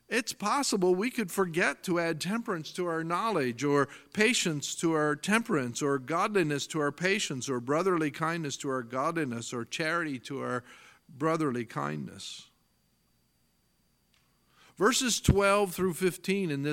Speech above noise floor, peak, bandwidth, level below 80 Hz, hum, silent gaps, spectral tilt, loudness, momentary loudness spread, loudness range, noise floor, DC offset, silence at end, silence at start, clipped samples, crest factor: 42 dB; -8 dBFS; 17 kHz; -54 dBFS; none; none; -4 dB/octave; -29 LUFS; 9 LU; 8 LU; -71 dBFS; under 0.1%; 0 s; 0.1 s; under 0.1%; 22 dB